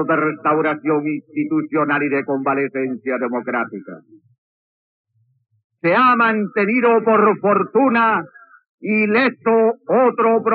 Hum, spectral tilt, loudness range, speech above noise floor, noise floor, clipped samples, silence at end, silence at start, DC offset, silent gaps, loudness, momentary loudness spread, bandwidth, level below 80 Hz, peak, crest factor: none; -4.5 dB/octave; 8 LU; over 73 dB; under -90 dBFS; under 0.1%; 0 s; 0 s; under 0.1%; 4.38-5.04 s, 5.64-5.70 s, 8.69-8.78 s; -17 LUFS; 9 LU; 4.9 kHz; under -90 dBFS; -4 dBFS; 14 dB